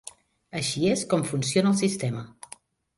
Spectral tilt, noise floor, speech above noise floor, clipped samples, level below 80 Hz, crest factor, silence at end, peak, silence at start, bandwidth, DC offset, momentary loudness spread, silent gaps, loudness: -5 dB/octave; -51 dBFS; 26 dB; under 0.1%; -62 dBFS; 18 dB; 0.7 s; -10 dBFS; 0.05 s; 11.5 kHz; under 0.1%; 21 LU; none; -25 LUFS